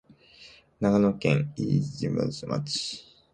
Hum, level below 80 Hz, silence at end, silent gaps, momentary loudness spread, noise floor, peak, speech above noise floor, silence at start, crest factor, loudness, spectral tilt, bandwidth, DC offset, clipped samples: none; -58 dBFS; 0.3 s; none; 8 LU; -53 dBFS; -8 dBFS; 27 dB; 0.4 s; 20 dB; -27 LUFS; -6 dB/octave; 9.6 kHz; under 0.1%; under 0.1%